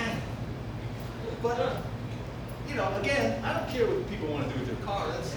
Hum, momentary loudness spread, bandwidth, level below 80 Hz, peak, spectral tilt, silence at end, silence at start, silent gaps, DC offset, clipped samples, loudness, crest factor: none; 10 LU; over 20 kHz; -46 dBFS; -14 dBFS; -6 dB/octave; 0 s; 0 s; none; under 0.1%; under 0.1%; -32 LUFS; 16 dB